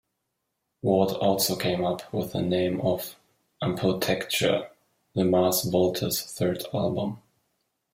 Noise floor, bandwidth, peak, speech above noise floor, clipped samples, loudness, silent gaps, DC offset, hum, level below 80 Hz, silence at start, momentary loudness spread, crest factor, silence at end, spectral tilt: -80 dBFS; 16.5 kHz; -8 dBFS; 55 dB; under 0.1%; -26 LUFS; none; under 0.1%; none; -60 dBFS; 0.85 s; 9 LU; 18 dB; 0.75 s; -5 dB/octave